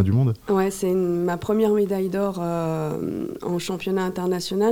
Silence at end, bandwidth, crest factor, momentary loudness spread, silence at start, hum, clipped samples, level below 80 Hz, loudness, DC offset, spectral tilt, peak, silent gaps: 0 s; 17.5 kHz; 14 dB; 7 LU; 0 s; none; under 0.1%; -54 dBFS; -24 LUFS; 0.2%; -7 dB/octave; -8 dBFS; none